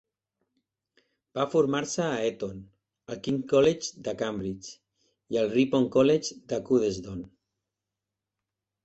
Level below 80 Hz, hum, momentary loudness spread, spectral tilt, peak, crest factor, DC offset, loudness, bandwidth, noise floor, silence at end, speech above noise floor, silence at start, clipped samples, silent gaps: -62 dBFS; none; 17 LU; -5 dB/octave; -10 dBFS; 18 dB; under 0.1%; -27 LUFS; 8.4 kHz; -88 dBFS; 1.6 s; 61 dB; 1.35 s; under 0.1%; none